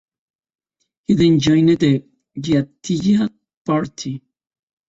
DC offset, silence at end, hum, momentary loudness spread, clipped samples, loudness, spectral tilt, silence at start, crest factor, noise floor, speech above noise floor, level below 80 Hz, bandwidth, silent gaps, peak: under 0.1%; 0.7 s; none; 17 LU; under 0.1%; -17 LUFS; -6.5 dB/octave; 1.1 s; 16 dB; -72 dBFS; 56 dB; -50 dBFS; 8 kHz; 3.57-3.65 s; -4 dBFS